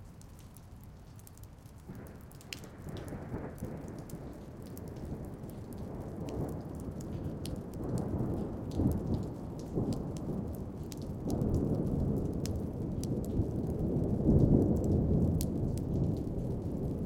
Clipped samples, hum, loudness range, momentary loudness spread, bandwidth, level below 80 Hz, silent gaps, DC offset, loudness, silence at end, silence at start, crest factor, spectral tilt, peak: under 0.1%; none; 14 LU; 20 LU; 17 kHz; -44 dBFS; none; under 0.1%; -35 LUFS; 0 s; 0 s; 22 dB; -8 dB/octave; -12 dBFS